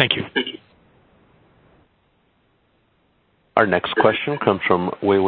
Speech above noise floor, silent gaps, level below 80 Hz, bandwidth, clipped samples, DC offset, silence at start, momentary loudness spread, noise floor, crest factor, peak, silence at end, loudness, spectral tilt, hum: 44 dB; none; -54 dBFS; 4.6 kHz; under 0.1%; under 0.1%; 0 s; 7 LU; -63 dBFS; 22 dB; 0 dBFS; 0 s; -20 LUFS; -8 dB/octave; none